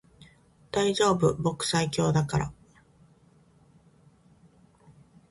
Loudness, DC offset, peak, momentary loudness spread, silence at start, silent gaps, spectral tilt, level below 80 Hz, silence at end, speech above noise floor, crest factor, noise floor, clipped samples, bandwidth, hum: -26 LUFS; under 0.1%; -12 dBFS; 8 LU; 0.2 s; none; -5 dB/octave; -54 dBFS; 2.8 s; 35 dB; 18 dB; -60 dBFS; under 0.1%; 11.5 kHz; none